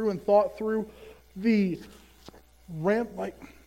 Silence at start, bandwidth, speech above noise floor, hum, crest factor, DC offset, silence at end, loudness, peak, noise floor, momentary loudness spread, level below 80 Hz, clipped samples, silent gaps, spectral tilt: 0 s; 16 kHz; 25 dB; none; 18 dB; under 0.1%; 0.2 s; -27 LUFS; -10 dBFS; -52 dBFS; 17 LU; -58 dBFS; under 0.1%; none; -7.5 dB/octave